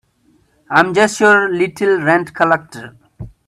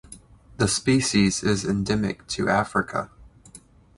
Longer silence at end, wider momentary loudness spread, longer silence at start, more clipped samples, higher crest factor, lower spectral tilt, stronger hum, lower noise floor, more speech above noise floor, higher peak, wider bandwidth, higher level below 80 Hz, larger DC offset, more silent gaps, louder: second, 0.2 s vs 0.4 s; about the same, 7 LU vs 8 LU; first, 0.7 s vs 0.1 s; neither; about the same, 16 dB vs 18 dB; about the same, -4.5 dB/octave vs -4.5 dB/octave; neither; first, -56 dBFS vs -50 dBFS; first, 42 dB vs 27 dB; first, 0 dBFS vs -6 dBFS; first, 13 kHz vs 11.5 kHz; about the same, -50 dBFS vs -46 dBFS; neither; neither; first, -14 LUFS vs -23 LUFS